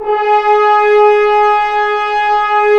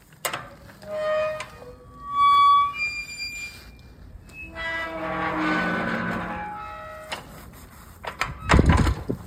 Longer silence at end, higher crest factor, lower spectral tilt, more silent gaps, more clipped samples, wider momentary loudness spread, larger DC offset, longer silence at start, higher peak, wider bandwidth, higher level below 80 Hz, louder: about the same, 0 s vs 0 s; second, 10 dB vs 22 dB; second, -2.5 dB/octave vs -5.5 dB/octave; neither; neither; second, 5 LU vs 25 LU; neither; about the same, 0 s vs 0.1 s; about the same, 0 dBFS vs -2 dBFS; second, 6.6 kHz vs 16 kHz; second, -44 dBFS vs -34 dBFS; first, -11 LUFS vs -24 LUFS